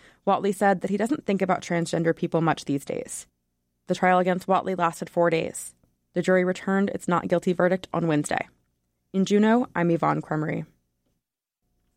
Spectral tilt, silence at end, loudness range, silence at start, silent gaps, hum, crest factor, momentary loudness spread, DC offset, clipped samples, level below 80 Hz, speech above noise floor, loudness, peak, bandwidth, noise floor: -6 dB/octave; 1.3 s; 2 LU; 0.25 s; none; 60 Hz at -50 dBFS; 16 dB; 11 LU; under 0.1%; under 0.1%; -64 dBFS; 58 dB; -24 LUFS; -10 dBFS; 15.5 kHz; -82 dBFS